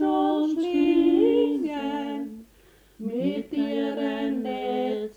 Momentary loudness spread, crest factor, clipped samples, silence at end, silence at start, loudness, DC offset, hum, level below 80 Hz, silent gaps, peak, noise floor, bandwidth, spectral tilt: 12 LU; 14 dB; under 0.1%; 0.05 s; 0 s; -25 LUFS; under 0.1%; none; -60 dBFS; none; -10 dBFS; -56 dBFS; 8.2 kHz; -7 dB/octave